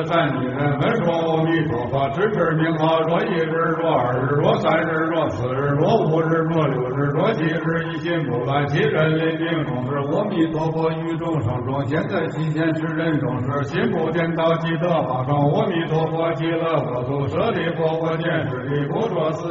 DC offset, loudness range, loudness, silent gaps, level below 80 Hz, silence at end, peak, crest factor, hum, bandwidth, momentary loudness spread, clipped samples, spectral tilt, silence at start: under 0.1%; 3 LU; -21 LUFS; none; -50 dBFS; 0 s; -4 dBFS; 16 dB; none; 7.6 kHz; 5 LU; under 0.1%; -6 dB/octave; 0 s